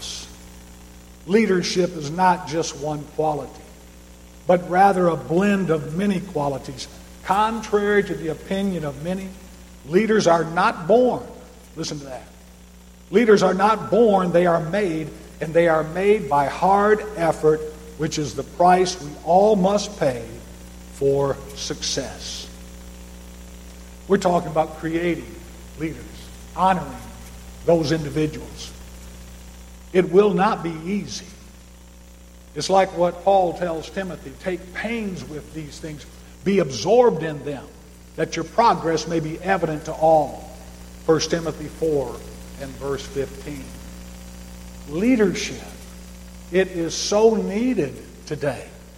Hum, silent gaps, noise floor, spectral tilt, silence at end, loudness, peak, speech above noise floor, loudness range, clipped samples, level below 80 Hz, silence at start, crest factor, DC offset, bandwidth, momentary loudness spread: 60 Hz at -45 dBFS; none; -45 dBFS; -5.5 dB/octave; 0 s; -21 LUFS; -2 dBFS; 25 dB; 7 LU; under 0.1%; -44 dBFS; 0 s; 18 dB; under 0.1%; 16.5 kHz; 22 LU